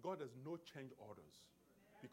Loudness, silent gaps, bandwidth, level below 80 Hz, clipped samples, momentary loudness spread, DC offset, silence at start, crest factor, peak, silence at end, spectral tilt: -54 LUFS; none; 16 kHz; -88 dBFS; under 0.1%; 15 LU; under 0.1%; 0 s; 20 dB; -34 dBFS; 0 s; -6 dB/octave